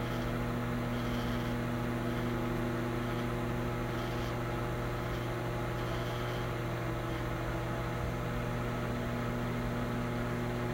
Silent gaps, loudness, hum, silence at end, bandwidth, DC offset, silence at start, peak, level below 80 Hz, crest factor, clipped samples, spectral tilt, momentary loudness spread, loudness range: none; -35 LUFS; 60 Hz at -40 dBFS; 0 s; 16 kHz; under 0.1%; 0 s; -22 dBFS; -44 dBFS; 12 dB; under 0.1%; -6.5 dB/octave; 2 LU; 1 LU